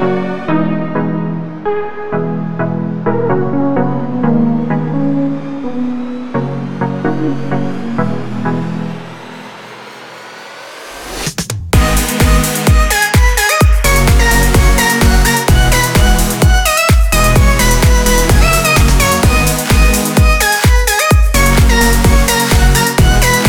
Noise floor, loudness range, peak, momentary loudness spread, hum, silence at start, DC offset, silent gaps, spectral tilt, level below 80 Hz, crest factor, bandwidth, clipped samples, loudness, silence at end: -31 dBFS; 9 LU; 0 dBFS; 12 LU; none; 0 s; 2%; none; -4.5 dB/octave; -14 dBFS; 12 dB; 19.5 kHz; under 0.1%; -12 LUFS; 0 s